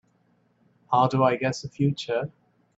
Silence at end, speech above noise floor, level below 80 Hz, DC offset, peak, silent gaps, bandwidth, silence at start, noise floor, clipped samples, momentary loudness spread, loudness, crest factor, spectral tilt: 0.45 s; 42 dB; -64 dBFS; under 0.1%; -6 dBFS; none; 7.8 kHz; 0.9 s; -66 dBFS; under 0.1%; 8 LU; -25 LUFS; 20 dB; -6.5 dB/octave